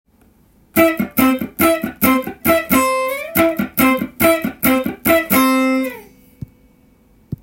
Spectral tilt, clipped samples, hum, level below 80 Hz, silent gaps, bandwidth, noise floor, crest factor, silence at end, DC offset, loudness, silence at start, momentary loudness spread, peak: -4.5 dB/octave; under 0.1%; none; -46 dBFS; none; 17 kHz; -53 dBFS; 16 dB; 0.05 s; under 0.1%; -16 LUFS; 0.75 s; 5 LU; 0 dBFS